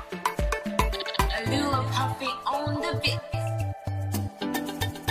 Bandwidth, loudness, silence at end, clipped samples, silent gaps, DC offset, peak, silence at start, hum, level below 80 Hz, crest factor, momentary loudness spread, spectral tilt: 15.5 kHz; -28 LUFS; 0 s; under 0.1%; none; under 0.1%; -8 dBFS; 0 s; none; -38 dBFS; 20 dB; 5 LU; -5 dB/octave